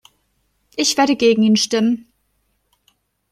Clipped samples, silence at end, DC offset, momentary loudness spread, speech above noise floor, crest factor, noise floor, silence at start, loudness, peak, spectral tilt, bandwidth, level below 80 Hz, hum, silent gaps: under 0.1%; 1.3 s; under 0.1%; 9 LU; 51 dB; 18 dB; -67 dBFS; 0.75 s; -16 LUFS; -2 dBFS; -3.5 dB/octave; 14 kHz; -62 dBFS; none; none